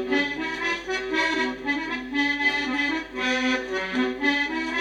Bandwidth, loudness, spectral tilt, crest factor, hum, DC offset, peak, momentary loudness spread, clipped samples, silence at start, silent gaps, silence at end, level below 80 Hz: 10.5 kHz; -24 LUFS; -3 dB/octave; 16 dB; none; under 0.1%; -8 dBFS; 5 LU; under 0.1%; 0 s; none; 0 s; -54 dBFS